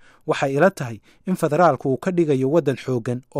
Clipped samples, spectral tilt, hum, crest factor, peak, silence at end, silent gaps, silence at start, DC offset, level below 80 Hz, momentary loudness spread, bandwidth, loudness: under 0.1%; -7 dB/octave; none; 16 dB; -4 dBFS; 0 s; none; 0.25 s; under 0.1%; -62 dBFS; 11 LU; 15.5 kHz; -20 LUFS